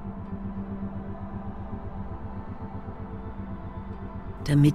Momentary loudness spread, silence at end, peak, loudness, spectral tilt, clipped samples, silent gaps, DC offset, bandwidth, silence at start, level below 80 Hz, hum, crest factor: 4 LU; 0 s; -8 dBFS; -34 LUFS; -8 dB/octave; under 0.1%; none; under 0.1%; 13.5 kHz; 0 s; -42 dBFS; none; 22 dB